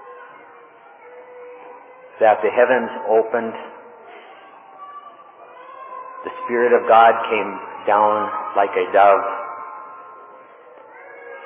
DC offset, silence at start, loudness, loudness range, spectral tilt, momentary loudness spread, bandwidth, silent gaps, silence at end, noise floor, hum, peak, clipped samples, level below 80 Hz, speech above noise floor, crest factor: under 0.1%; 0.05 s; -17 LUFS; 10 LU; -7.5 dB/octave; 26 LU; 3.9 kHz; none; 0 s; -45 dBFS; none; 0 dBFS; under 0.1%; -74 dBFS; 29 dB; 20 dB